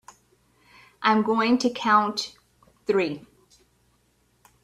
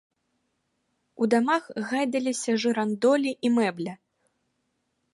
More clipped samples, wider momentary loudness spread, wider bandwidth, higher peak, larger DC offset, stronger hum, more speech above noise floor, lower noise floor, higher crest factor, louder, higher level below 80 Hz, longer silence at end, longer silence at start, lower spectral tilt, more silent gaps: neither; first, 15 LU vs 7 LU; about the same, 12.5 kHz vs 11.5 kHz; first, -4 dBFS vs -10 dBFS; neither; neither; second, 44 dB vs 51 dB; second, -66 dBFS vs -76 dBFS; about the same, 22 dB vs 18 dB; about the same, -23 LUFS vs -25 LUFS; first, -68 dBFS vs -78 dBFS; first, 1.45 s vs 1.2 s; second, 1 s vs 1.2 s; about the same, -4.5 dB/octave vs -4.5 dB/octave; neither